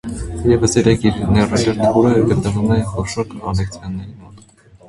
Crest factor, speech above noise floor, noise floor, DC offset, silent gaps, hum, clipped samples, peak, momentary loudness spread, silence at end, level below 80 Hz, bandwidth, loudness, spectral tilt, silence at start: 16 dB; 30 dB; -46 dBFS; under 0.1%; none; none; under 0.1%; 0 dBFS; 13 LU; 0.5 s; -32 dBFS; 11.5 kHz; -16 LUFS; -6 dB/octave; 0.05 s